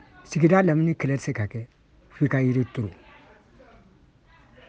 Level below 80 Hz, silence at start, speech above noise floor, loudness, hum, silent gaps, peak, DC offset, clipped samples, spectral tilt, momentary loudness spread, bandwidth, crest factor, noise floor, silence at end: -58 dBFS; 0.3 s; 34 dB; -24 LUFS; none; none; -6 dBFS; under 0.1%; under 0.1%; -8 dB/octave; 15 LU; 8.8 kHz; 20 dB; -56 dBFS; 1.75 s